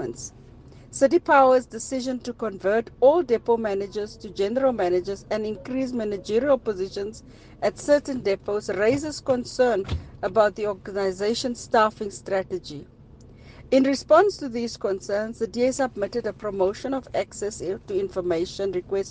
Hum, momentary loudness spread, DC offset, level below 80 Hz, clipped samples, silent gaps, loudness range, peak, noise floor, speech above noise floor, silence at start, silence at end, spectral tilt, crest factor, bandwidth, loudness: none; 12 LU; under 0.1%; -50 dBFS; under 0.1%; none; 5 LU; -4 dBFS; -48 dBFS; 24 dB; 0 s; 0 s; -5 dB/octave; 20 dB; 9.6 kHz; -24 LUFS